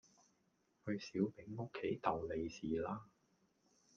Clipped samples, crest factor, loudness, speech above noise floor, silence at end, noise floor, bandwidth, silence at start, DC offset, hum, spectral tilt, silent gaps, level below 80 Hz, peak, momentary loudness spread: under 0.1%; 24 dB; -43 LUFS; 38 dB; 0.9 s; -79 dBFS; 7.2 kHz; 0.85 s; under 0.1%; none; -6.5 dB/octave; none; -70 dBFS; -20 dBFS; 8 LU